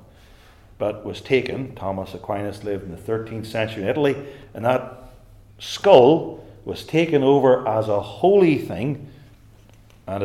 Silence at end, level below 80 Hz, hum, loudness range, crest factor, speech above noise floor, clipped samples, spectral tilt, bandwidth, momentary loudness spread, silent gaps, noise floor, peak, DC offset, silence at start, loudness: 0 s; -52 dBFS; none; 9 LU; 22 dB; 29 dB; under 0.1%; -6.5 dB/octave; 14 kHz; 17 LU; none; -49 dBFS; 0 dBFS; under 0.1%; 0.8 s; -20 LUFS